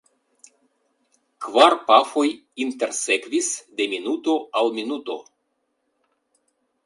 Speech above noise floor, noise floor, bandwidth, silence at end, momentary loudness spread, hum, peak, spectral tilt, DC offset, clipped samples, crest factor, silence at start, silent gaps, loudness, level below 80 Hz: 52 dB; -73 dBFS; 11.5 kHz; 1.65 s; 13 LU; none; 0 dBFS; -1 dB/octave; under 0.1%; under 0.1%; 24 dB; 1.4 s; none; -21 LUFS; -78 dBFS